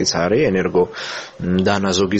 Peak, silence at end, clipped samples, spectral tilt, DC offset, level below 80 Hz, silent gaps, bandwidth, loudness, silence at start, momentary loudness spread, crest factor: -2 dBFS; 0 s; under 0.1%; -4.5 dB/octave; under 0.1%; -46 dBFS; none; 8.4 kHz; -18 LUFS; 0 s; 10 LU; 16 dB